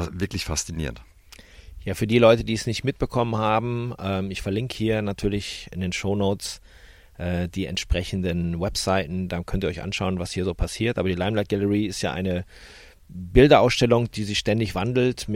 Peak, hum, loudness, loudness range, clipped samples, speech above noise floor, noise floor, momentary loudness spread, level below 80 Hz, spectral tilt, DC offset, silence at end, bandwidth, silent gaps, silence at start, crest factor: -2 dBFS; none; -24 LUFS; 6 LU; under 0.1%; 24 dB; -47 dBFS; 12 LU; -38 dBFS; -5.5 dB/octave; under 0.1%; 0 s; 16.5 kHz; none; 0 s; 20 dB